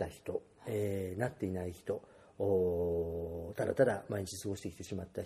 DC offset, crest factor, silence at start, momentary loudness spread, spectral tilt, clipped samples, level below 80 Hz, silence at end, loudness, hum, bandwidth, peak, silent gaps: under 0.1%; 20 dB; 0 s; 11 LU; -6.5 dB/octave; under 0.1%; -60 dBFS; 0 s; -37 LUFS; none; 15 kHz; -16 dBFS; none